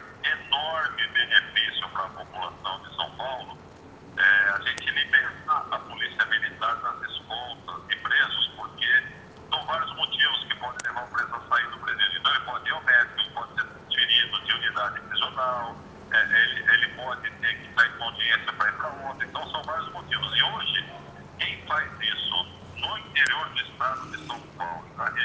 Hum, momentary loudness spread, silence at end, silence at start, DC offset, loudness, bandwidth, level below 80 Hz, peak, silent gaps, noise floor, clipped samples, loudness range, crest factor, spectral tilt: none; 14 LU; 0 s; 0 s; under 0.1%; -25 LUFS; 9.2 kHz; -62 dBFS; -4 dBFS; none; -47 dBFS; under 0.1%; 4 LU; 22 dB; -2 dB/octave